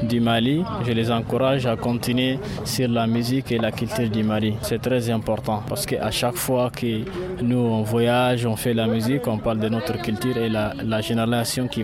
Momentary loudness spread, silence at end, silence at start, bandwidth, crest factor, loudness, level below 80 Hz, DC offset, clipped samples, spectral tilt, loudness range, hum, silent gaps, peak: 5 LU; 0 s; 0 s; 16 kHz; 14 dB; -22 LUFS; -46 dBFS; under 0.1%; under 0.1%; -5.5 dB/octave; 1 LU; none; none; -8 dBFS